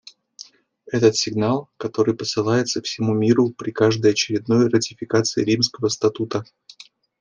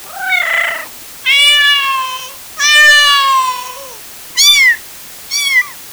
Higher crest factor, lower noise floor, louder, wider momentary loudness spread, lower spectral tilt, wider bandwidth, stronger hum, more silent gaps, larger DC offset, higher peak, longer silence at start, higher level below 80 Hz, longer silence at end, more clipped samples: first, 18 dB vs 12 dB; first, -48 dBFS vs -32 dBFS; second, -20 LUFS vs -9 LUFS; second, 7 LU vs 22 LU; first, -5 dB/octave vs 3.5 dB/octave; second, 10 kHz vs over 20 kHz; neither; neither; neither; second, -4 dBFS vs 0 dBFS; first, 0.4 s vs 0 s; second, -62 dBFS vs -52 dBFS; first, 0.8 s vs 0 s; neither